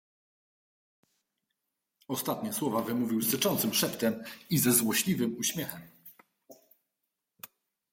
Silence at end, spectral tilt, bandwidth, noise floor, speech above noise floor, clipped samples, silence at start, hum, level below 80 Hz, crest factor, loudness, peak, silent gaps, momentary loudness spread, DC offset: 0.45 s; -3.5 dB/octave; 16.5 kHz; -85 dBFS; 55 dB; under 0.1%; 2.1 s; none; -72 dBFS; 22 dB; -29 LUFS; -12 dBFS; none; 21 LU; under 0.1%